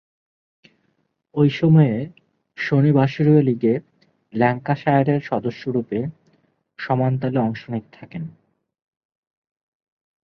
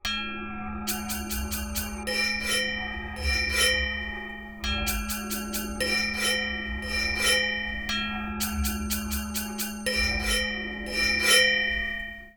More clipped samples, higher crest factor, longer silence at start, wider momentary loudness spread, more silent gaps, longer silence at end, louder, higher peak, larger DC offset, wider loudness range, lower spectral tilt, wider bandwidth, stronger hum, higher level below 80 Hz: neither; about the same, 18 dB vs 22 dB; first, 1.35 s vs 0.05 s; first, 17 LU vs 10 LU; neither; first, 1.95 s vs 0.05 s; first, -20 LUFS vs -26 LUFS; about the same, -4 dBFS vs -6 dBFS; neither; first, 8 LU vs 4 LU; first, -9.5 dB/octave vs -2 dB/octave; second, 6.2 kHz vs over 20 kHz; neither; second, -60 dBFS vs -38 dBFS